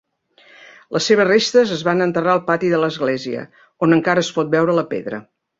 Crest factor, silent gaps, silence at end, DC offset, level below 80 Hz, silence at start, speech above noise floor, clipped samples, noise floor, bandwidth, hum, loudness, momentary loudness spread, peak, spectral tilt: 16 dB; none; 0.35 s; under 0.1%; -62 dBFS; 0.9 s; 35 dB; under 0.1%; -52 dBFS; 7.8 kHz; none; -17 LUFS; 12 LU; -2 dBFS; -5 dB/octave